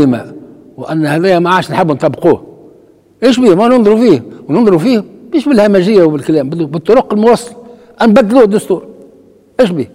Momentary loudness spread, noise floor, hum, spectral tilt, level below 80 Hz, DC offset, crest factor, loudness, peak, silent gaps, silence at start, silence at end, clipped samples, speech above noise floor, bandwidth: 9 LU; -43 dBFS; none; -7 dB/octave; -48 dBFS; under 0.1%; 10 dB; -10 LUFS; 0 dBFS; none; 0 s; 0.1 s; 0.5%; 35 dB; 15.5 kHz